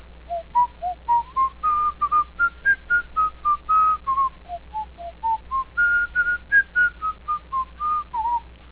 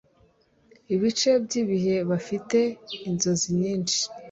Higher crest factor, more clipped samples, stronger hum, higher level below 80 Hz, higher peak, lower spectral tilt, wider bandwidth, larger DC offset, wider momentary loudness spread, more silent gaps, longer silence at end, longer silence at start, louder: about the same, 14 dB vs 16 dB; neither; neither; first, -46 dBFS vs -62 dBFS; about the same, -8 dBFS vs -10 dBFS; first, -6.5 dB/octave vs -4.5 dB/octave; second, 4 kHz vs 8.2 kHz; neither; first, 12 LU vs 6 LU; neither; about the same, 0.05 s vs 0 s; second, 0.1 s vs 0.9 s; first, -22 LUFS vs -25 LUFS